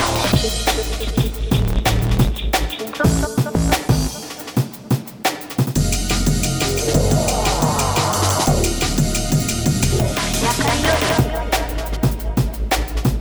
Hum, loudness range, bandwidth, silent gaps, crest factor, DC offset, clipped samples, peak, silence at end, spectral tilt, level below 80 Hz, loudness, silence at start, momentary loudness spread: none; 3 LU; over 20 kHz; none; 16 dB; under 0.1%; under 0.1%; -2 dBFS; 0 s; -4.5 dB/octave; -24 dBFS; -19 LUFS; 0 s; 5 LU